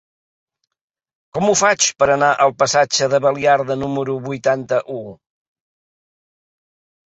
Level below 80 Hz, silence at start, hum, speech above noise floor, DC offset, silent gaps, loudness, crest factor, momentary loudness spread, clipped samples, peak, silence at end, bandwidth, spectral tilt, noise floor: -58 dBFS; 1.35 s; none; over 73 dB; under 0.1%; none; -16 LUFS; 18 dB; 9 LU; under 0.1%; -2 dBFS; 2.05 s; 8.4 kHz; -3 dB/octave; under -90 dBFS